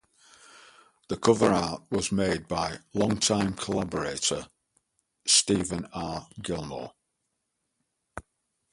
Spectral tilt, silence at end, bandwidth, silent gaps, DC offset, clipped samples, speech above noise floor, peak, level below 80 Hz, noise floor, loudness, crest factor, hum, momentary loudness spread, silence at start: -3.5 dB/octave; 0.5 s; 11.5 kHz; none; under 0.1%; under 0.1%; 52 dB; -6 dBFS; -54 dBFS; -80 dBFS; -27 LUFS; 24 dB; none; 17 LU; 1.1 s